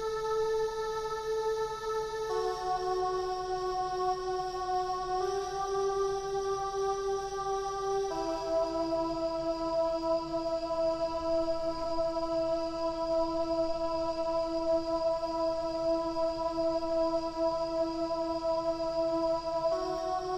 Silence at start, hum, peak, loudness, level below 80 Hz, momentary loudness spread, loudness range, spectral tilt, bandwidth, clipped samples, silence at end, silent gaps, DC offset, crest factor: 0 s; none; -20 dBFS; -32 LUFS; -52 dBFS; 3 LU; 1 LU; -4.5 dB/octave; 13.5 kHz; under 0.1%; 0 s; none; under 0.1%; 12 dB